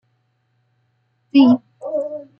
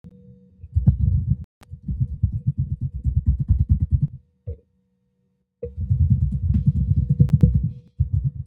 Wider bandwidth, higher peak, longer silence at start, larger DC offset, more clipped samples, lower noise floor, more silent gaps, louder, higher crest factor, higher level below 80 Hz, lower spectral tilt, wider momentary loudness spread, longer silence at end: first, 5.8 kHz vs 1.6 kHz; about the same, -2 dBFS vs -2 dBFS; first, 1.35 s vs 0.05 s; neither; neither; second, -66 dBFS vs -70 dBFS; second, none vs 1.44-1.61 s; first, -17 LUFS vs -22 LUFS; about the same, 18 dB vs 20 dB; second, -72 dBFS vs -28 dBFS; second, -8 dB/octave vs -12.5 dB/octave; second, 12 LU vs 18 LU; first, 0.15 s vs 0 s